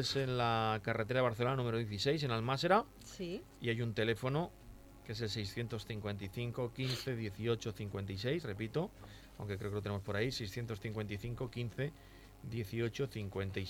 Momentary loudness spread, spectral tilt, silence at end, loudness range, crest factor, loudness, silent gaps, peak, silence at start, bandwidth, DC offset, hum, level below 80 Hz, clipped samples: 12 LU; -6 dB/octave; 0 s; 6 LU; 20 dB; -38 LUFS; none; -18 dBFS; 0 s; 16.5 kHz; under 0.1%; none; -60 dBFS; under 0.1%